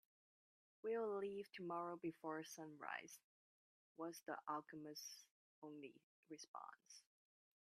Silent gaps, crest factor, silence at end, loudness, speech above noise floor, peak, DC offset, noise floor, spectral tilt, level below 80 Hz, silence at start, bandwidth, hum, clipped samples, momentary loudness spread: 3.24-3.95 s, 5.31-5.62 s, 6.03-6.23 s, 6.48-6.54 s; 20 dB; 0.6 s; -51 LUFS; over 38 dB; -32 dBFS; under 0.1%; under -90 dBFS; -4 dB/octave; under -90 dBFS; 0.85 s; 14 kHz; none; under 0.1%; 16 LU